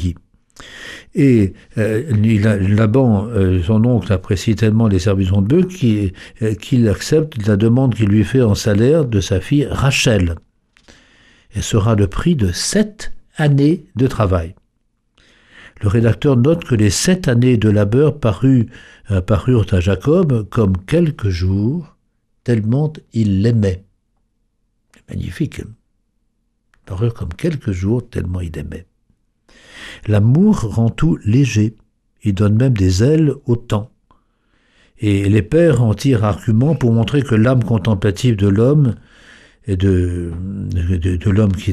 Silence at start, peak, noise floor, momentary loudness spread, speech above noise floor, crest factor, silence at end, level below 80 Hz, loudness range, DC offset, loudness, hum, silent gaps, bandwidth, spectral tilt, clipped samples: 0 s; -2 dBFS; -65 dBFS; 11 LU; 50 dB; 14 dB; 0 s; -36 dBFS; 8 LU; under 0.1%; -16 LUFS; none; none; 13.5 kHz; -7 dB/octave; under 0.1%